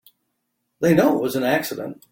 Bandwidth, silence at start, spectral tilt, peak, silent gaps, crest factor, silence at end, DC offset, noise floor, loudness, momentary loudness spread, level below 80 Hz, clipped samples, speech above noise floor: 17 kHz; 0.8 s; -6 dB/octave; -4 dBFS; none; 18 dB; 0.2 s; under 0.1%; -75 dBFS; -20 LUFS; 11 LU; -58 dBFS; under 0.1%; 55 dB